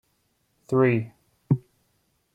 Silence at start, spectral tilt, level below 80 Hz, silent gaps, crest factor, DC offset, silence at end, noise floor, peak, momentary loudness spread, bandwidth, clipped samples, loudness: 0.7 s; -9.5 dB/octave; -64 dBFS; none; 18 dB; under 0.1%; 0.75 s; -71 dBFS; -8 dBFS; 7 LU; 8.6 kHz; under 0.1%; -25 LUFS